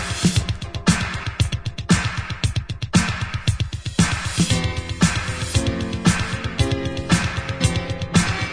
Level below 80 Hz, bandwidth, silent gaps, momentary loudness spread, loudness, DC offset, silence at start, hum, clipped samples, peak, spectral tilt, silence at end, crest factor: -32 dBFS; 11 kHz; none; 5 LU; -22 LUFS; under 0.1%; 0 s; none; under 0.1%; -4 dBFS; -4.5 dB/octave; 0 s; 18 dB